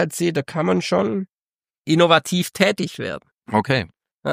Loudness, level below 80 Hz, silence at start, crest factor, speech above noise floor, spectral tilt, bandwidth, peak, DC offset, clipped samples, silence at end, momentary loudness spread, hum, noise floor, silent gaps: -20 LUFS; -58 dBFS; 0 s; 20 dB; over 70 dB; -5 dB/octave; 15.5 kHz; 0 dBFS; under 0.1%; under 0.1%; 0 s; 16 LU; none; under -90 dBFS; 1.29-1.59 s, 1.78-1.84 s, 4.14-4.18 s